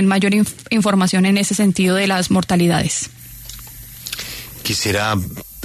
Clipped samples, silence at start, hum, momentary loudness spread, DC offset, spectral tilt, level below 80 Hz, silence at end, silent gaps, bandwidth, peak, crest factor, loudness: under 0.1%; 0 s; none; 18 LU; under 0.1%; -4.5 dB/octave; -44 dBFS; 0 s; none; 13.5 kHz; -4 dBFS; 14 dB; -17 LUFS